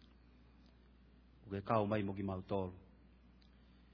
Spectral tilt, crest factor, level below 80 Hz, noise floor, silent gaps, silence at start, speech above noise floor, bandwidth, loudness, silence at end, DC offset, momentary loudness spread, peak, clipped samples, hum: -7 dB/octave; 24 dB; -66 dBFS; -64 dBFS; none; 0.6 s; 26 dB; 5.4 kHz; -40 LUFS; 1.15 s; under 0.1%; 17 LU; -20 dBFS; under 0.1%; none